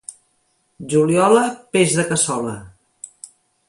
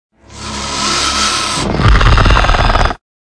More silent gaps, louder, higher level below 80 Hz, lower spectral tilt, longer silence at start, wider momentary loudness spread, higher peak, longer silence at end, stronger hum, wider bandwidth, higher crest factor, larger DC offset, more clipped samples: neither; second, -17 LUFS vs -12 LUFS; second, -58 dBFS vs -16 dBFS; about the same, -4.5 dB/octave vs -3.5 dB/octave; second, 0.1 s vs 0.3 s; first, 23 LU vs 10 LU; about the same, -2 dBFS vs 0 dBFS; first, 1 s vs 0.3 s; neither; about the same, 11.5 kHz vs 10.5 kHz; first, 18 dB vs 12 dB; neither; neither